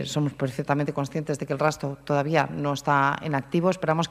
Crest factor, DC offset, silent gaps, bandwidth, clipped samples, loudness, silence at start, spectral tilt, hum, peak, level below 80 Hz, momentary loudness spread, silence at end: 20 dB; under 0.1%; none; 14.5 kHz; under 0.1%; -26 LUFS; 0 s; -6 dB/octave; none; -4 dBFS; -58 dBFS; 7 LU; 0 s